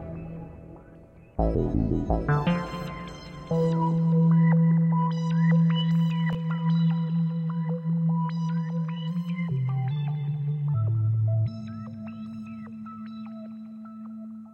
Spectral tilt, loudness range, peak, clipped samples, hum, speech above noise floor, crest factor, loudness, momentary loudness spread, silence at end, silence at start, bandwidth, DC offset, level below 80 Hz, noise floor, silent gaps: -9.5 dB/octave; 7 LU; -10 dBFS; under 0.1%; none; 25 dB; 16 dB; -25 LUFS; 18 LU; 0 s; 0 s; 5.6 kHz; under 0.1%; -42 dBFS; -50 dBFS; none